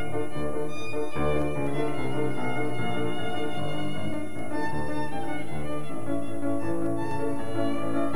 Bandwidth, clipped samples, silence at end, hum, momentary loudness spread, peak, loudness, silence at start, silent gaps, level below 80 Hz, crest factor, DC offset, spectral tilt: 17.5 kHz; under 0.1%; 0 s; none; 5 LU; -12 dBFS; -31 LUFS; 0 s; none; -50 dBFS; 16 dB; 7%; -6.5 dB/octave